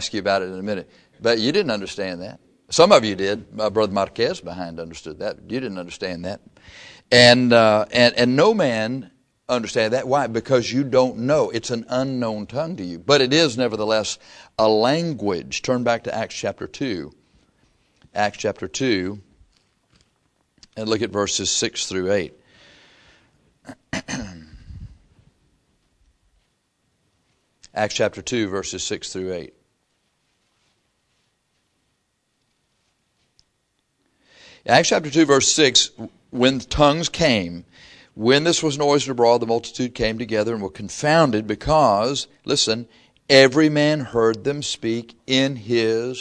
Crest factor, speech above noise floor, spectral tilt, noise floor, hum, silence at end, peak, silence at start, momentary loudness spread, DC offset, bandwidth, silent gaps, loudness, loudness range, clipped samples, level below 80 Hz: 22 dB; 51 dB; -4 dB/octave; -71 dBFS; none; 0 s; 0 dBFS; 0 s; 16 LU; under 0.1%; 10.5 kHz; none; -20 LUFS; 12 LU; under 0.1%; -50 dBFS